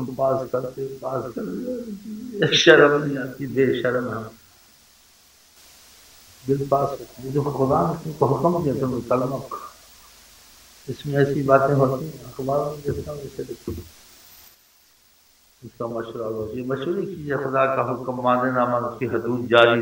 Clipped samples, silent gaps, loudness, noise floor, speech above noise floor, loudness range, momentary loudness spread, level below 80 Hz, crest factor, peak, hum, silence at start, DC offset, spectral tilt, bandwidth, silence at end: under 0.1%; none; -22 LUFS; -57 dBFS; 35 dB; 11 LU; 16 LU; -54 dBFS; 24 dB; 0 dBFS; none; 0 s; under 0.1%; -5.5 dB/octave; 16.5 kHz; 0 s